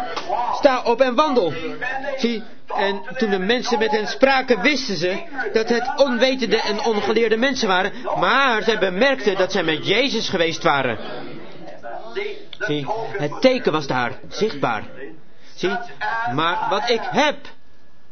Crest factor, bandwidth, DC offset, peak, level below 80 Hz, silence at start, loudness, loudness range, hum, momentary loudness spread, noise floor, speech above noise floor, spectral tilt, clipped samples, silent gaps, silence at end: 20 dB; 6.6 kHz; 3%; 0 dBFS; -54 dBFS; 0 s; -20 LUFS; 5 LU; none; 12 LU; -55 dBFS; 35 dB; -4 dB/octave; under 0.1%; none; 0.6 s